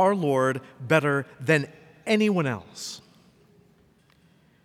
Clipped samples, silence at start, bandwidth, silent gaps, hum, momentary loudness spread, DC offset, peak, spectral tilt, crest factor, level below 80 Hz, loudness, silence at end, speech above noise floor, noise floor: under 0.1%; 0 s; 16 kHz; none; none; 15 LU; under 0.1%; -6 dBFS; -6 dB/octave; 20 dB; -72 dBFS; -25 LUFS; 1.65 s; 36 dB; -60 dBFS